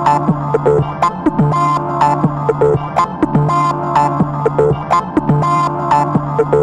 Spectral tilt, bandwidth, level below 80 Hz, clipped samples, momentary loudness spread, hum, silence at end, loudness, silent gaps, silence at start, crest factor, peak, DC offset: -8 dB/octave; 9.6 kHz; -38 dBFS; under 0.1%; 2 LU; none; 0 s; -14 LUFS; none; 0 s; 12 dB; 0 dBFS; under 0.1%